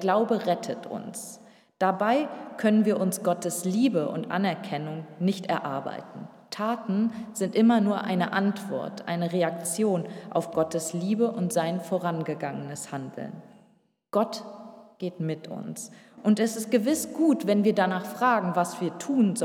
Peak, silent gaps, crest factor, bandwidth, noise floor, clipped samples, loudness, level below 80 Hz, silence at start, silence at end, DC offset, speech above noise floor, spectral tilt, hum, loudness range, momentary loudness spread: -10 dBFS; none; 18 dB; 16.5 kHz; -64 dBFS; under 0.1%; -27 LUFS; -78 dBFS; 0 s; 0 s; under 0.1%; 38 dB; -5.5 dB/octave; none; 7 LU; 14 LU